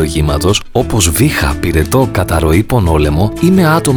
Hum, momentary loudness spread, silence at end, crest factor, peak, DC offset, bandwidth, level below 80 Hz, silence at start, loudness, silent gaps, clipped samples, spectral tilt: none; 4 LU; 0 s; 10 dB; 0 dBFS; under 0.1%; over 20 kHz; -22 dBFS; 0 s; -12 LUFS; none; under 0.1%; -5.5 dB/octave